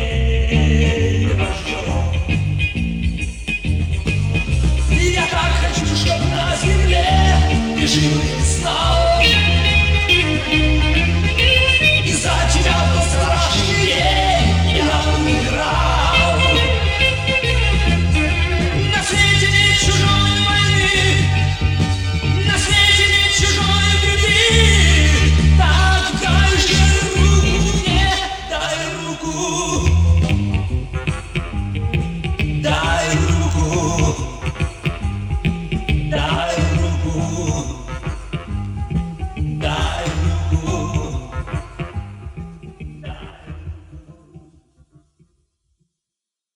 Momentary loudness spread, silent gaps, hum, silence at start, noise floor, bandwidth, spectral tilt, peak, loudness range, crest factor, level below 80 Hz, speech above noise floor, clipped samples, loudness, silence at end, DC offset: 12 LU; none; none; 0 s; -85 dBFS; 12 kHz; -4 dB/octave; 0 dBFS; 10 LU; 16 dB; -22 dBFS; 70 dB; under 0.1%; -16 LUFS; 2.15 s; 0.1%